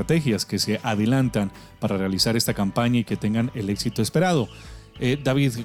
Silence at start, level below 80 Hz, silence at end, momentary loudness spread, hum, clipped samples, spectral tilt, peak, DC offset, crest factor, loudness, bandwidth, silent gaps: 0 s; -48 dBFS; 0 s; 7 LU; none; under 0.1%; -5.5 dB/octave; -6 dBFS; under 0.1%; 16 dB; -23 LUFS; 18 kHz; none